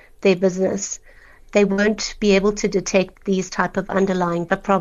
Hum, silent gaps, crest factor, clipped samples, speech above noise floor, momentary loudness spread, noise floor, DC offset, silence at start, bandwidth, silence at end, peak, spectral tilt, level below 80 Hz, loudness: none; none; 16 dB; under 0.1%; 26 dB; 6 LU; -46 dBFS; under 0.1%; 0.2 s; 8 kHz; 0 s; -2 dBFS; -5 dB/octave; -44 dBFS; -20 LUFS